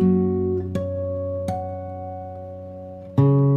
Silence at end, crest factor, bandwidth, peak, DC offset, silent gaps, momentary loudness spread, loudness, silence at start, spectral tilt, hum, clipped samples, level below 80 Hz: 0 s; 16 dB; 8.8 kHz; -6 dBFS; under 0.1%; none; 17 LU; -24 LUFS; 0 s; -10.5 dB/octave; none; under 0.1%; -52 dBFS